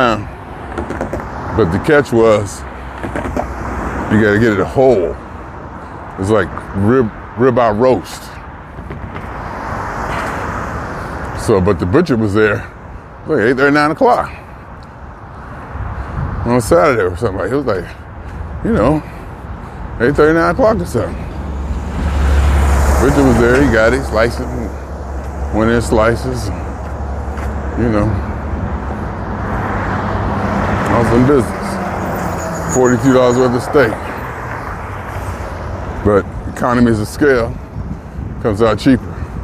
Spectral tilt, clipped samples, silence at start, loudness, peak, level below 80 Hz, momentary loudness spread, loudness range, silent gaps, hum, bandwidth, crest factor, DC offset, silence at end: -6.5 dB/octave; under 0.1%; 0 s; -15 LUFS; 0 dBFS; -24 dBFS; 17 LU; 5 LU; none; none; 15.5 kHz; 14 dB; under 0.1%; 0 s